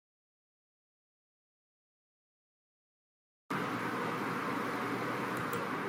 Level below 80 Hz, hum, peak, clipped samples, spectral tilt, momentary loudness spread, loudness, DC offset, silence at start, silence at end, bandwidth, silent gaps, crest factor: -80 dBFS; none; -24 dBFS; under 0.1%; -5 dB/octave; 1 LU; -36 LUFS; under 0.1%; 3.5 s; 0 s; 16 kHz; none; 16 dB